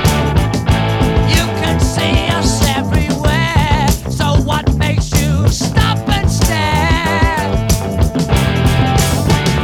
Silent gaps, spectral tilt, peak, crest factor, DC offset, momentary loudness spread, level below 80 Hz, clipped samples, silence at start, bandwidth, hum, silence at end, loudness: none; -5 dB/octave; 0 dBFS; 12 dB; under 0.1%; 2 LU; -20 dBFS; under 0.1%; 0 s; 19 kHz; none; 0 s; -14 LUFS